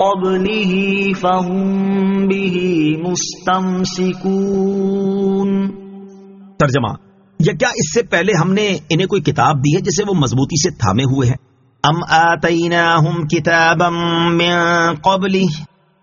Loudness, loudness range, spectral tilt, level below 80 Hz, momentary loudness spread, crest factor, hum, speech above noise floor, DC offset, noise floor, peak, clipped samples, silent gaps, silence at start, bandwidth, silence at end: -15 LUFS; 4 LU; -4.5 dB/octave; -46 dBFS; 6 LU; 16 dB; none; 24 dB; under 0.1%; -39 dBFS; 0 dBFS; under 0.1%; none; 0 s; 7.4 kHz; 0.35 s